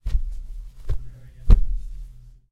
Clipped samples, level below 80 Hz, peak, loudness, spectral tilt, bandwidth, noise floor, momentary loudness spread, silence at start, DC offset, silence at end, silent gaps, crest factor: under 0.1%; -22 dBFS; -2 dBFS; -27 LUFS; -8.5 dB/octave; 4.4 kHz; -41 dBFS; 21 LU; 0.05 s; under 0.1%; 0.2 s; none; 18 dB